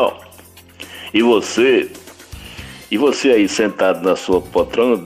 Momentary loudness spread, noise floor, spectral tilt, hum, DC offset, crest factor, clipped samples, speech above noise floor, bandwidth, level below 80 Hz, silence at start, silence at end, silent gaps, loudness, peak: 21 LU; -43 dBFS; -4 dB/octave; none; under 0.1%; 14 dB; under 0.1%; 28 dB; 16 kHz; -46 dBFS; 0 s; 0 s; none; -16 LUFS; -4 dBFS